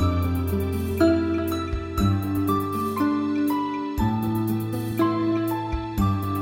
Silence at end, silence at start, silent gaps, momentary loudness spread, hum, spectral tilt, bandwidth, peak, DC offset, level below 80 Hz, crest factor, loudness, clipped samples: 0 s; 0 s; none; 5 LU; none; -7.5 dB/octave; 17 kHz; -8 dBFS; under 0.1%; -36 dBFS; 16 dB; -24 LUFS; under 0.1%